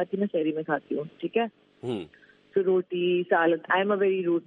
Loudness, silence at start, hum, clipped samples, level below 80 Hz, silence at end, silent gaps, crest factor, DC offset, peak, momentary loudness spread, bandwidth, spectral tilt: -27 LUFS; 0 s; none; under 0.1%; -76 dBFS; 0.05 s; none; 16 dB; under 0.1%; -10 dBFS; 11 LU; 4.1 kHz; -8 dB/octave